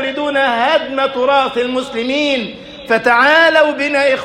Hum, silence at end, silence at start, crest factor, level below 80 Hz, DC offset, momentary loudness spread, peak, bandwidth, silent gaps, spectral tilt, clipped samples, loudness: none; 0 s; 0 s; 14 dB; -52 dBFS; under 0.1%; 10 LU; 0 dBFS; 14 kHz; none; -3.5 dB/octave; under 0.1%; -13 LUFS